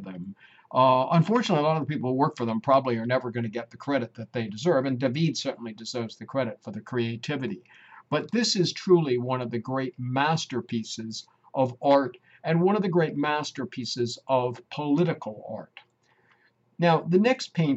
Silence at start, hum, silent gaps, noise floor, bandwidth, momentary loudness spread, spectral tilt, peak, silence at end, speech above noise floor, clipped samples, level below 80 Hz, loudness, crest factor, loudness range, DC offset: 0 s; none; none; -65 dBFS; 8.2 kHz; 13 LU; -6 dB/octave; -8 dBFS; 0 s; 39 dB; under 0.1%; -72 dBFS; -26 LUFS; 18 dB; 5 LU; under 0.1%